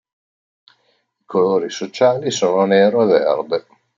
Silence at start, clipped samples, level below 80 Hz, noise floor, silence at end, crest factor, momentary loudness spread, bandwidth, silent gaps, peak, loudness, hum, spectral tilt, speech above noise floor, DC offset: 1.3 s; under 0.1%; -68 dBFS; -64 dBFS; 0.4 s; 16 dB; 10 LU; 7.6 kHz; none; -2 dBFS; -17 LUFS; none; -5 dB/octave; 49 dB; under 0.1%